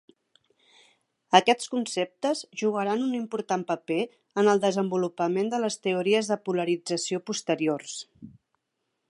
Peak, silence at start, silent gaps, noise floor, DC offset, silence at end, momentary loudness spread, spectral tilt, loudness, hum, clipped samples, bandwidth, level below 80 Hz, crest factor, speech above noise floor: -2 dBFS; 1.3 s; none; -80 dBFS; under 0.1%; 0.8 s; 8 LU; -4 dB/octave; -26 LUFS; none; under 0.1%; 11.5 kHz; -78 dBFS; 26 dB; 54 dB